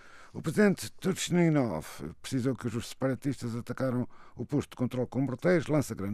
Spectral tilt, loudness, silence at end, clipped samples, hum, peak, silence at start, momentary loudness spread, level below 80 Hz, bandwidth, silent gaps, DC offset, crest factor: -6 dB/octave; -31 LUFS; 0 s; under 0.1%; none; -12 dBFS; 0.05 s; 12 LU; -60 dBFS; 15.5 kHz; none; under 0.1%; 20 dB